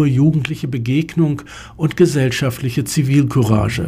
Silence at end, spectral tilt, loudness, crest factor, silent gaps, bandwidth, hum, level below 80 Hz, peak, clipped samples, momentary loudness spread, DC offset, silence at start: 0 s; -6.5 dB/octave; -17 LUFS; 14 dB; none; 16 kHz; none; -40 dBFS; -2 dBFS; under 0.1%; 8 LU; under 0.1%; 0 s